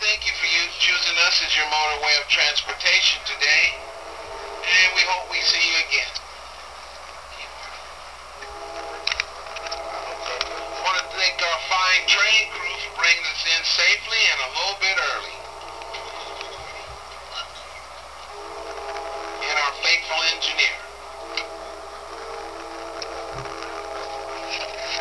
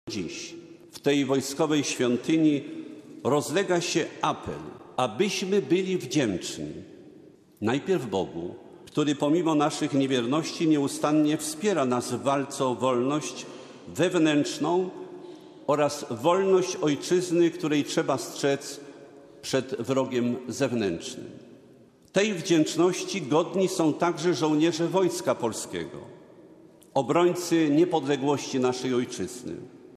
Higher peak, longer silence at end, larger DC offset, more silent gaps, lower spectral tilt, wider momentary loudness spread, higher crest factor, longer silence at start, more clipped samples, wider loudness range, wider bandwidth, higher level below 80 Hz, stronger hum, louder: first, -2 dBFS vs -8 dBFS; about the same, 0 s vs 0.05 s; first, 0.2% vs under 0.1%; neither; second, 0.5 dB/octave vs -5 dB/octave; first, 20 LU vs 15 LU; about the same, 22 dB vs 18 dB; about the same, 0 s vs 0.05 s; neither; first, 14 LU vs 4 LU; second, 11 kHz vs 14.5 kHz; first, -52 dBFS vs -70 dBFS; neither; first, -20 LUFS vs -26 LUFS